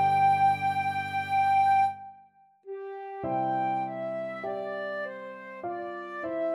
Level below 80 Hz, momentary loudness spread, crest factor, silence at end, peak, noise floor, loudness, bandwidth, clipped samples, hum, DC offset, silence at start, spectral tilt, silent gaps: -74 dBFS; 17 LU; 14 dB; 0 s; -14 dBFS; -58 dBFS; -28 LUFS; 12 kHz; under 0.1%; none; under 0.1%; 0 s; -6 dB/octave; none